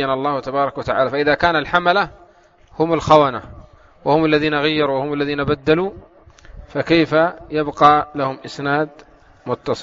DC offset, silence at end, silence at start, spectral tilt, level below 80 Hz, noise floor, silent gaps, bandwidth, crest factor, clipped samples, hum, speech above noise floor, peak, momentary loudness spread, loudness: under 0.1%; 0 s; 0 s; -3.5 dB/octave; -46 dBFS; -50 dBFS; none; 7.6 kHz; 18 dB; under 0.1%; none; 33 dB; 0 dBFS; 13 LU; -18 LUFS